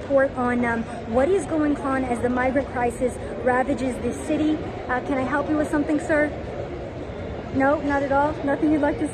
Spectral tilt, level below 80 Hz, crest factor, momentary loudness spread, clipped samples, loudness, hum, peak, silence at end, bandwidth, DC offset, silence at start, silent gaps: -6.5 dB/octave; -42 dBFS; 16 dB; 8 LU; under 0.1%; -23 LUFS; none; -8 dBFS; 0 s; 11.5 kHz; under 0.1%; 0 s; none